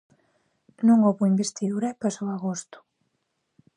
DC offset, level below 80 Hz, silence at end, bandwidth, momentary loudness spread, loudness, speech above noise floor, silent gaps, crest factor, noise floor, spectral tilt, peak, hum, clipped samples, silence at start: under 0.1%; -76 dBFS; 1.15 s; 10.5 kHz; 12 LU; -24 LUFS; 53 dB; none; 18 dB; -76 dBFS; -6.5 dB/octave; -8 dBFS; none; under 0.1%; 0.8 s